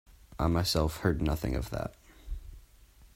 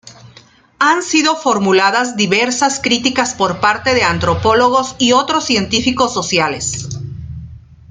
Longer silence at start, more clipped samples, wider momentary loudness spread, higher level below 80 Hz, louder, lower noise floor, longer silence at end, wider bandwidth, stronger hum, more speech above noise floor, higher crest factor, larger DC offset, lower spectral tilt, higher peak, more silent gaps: about the same, 0.1 s vs 0.05 s; neither; first, 18 LU vs 9 LU; about the same, -40 dBFS vs -44 dBFS; second, -31 LUFS vs -14 LUFS; first, -57 dBFS vs -45 dBFS; second, 0.1 s vs 0.3 s; first, 16 kHz vs 9.6 kHz; neither; about the same, 28 dB vs 31 dB; first, 20 dB vs 14 dB; neither; first, -5.5 dB/octave vs -3 dB/octave; second, -12 dBFS vs 0 dBFS; neither